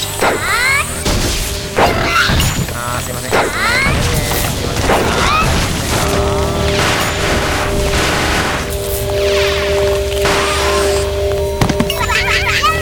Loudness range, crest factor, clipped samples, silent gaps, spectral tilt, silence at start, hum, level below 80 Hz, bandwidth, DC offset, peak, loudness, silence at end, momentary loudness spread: 1 LU; 14 dB; under 0.1%; none; -3.5 dB/octave; 0 s; none; -24 dBFS; 18 kHz; under 0.1%; 0 dBFS; -14 LUFS; 0 s; 5 LU